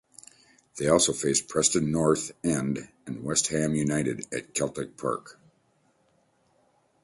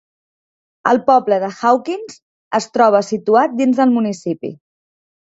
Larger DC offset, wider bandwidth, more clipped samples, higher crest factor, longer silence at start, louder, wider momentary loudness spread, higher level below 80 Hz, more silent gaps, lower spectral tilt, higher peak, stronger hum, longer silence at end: neither; first, 11.5 kHz vs 8 kHz; neither; first, 22 dB vs 16 dB; about the same, 0.75 s vs 0.85 s; second, -26 LUFS vs -16 LUFS; about the same, 12 LU vs 13 LU; first, -56 dBFS vs -64 dBFS; second, none vs 2.22-2.51 s; second, -4 dB/octave vs -5.5 dB/octave; second, -8 dBFS vs 0 dBFS; neither; first, 1.75 s vs 0.85 s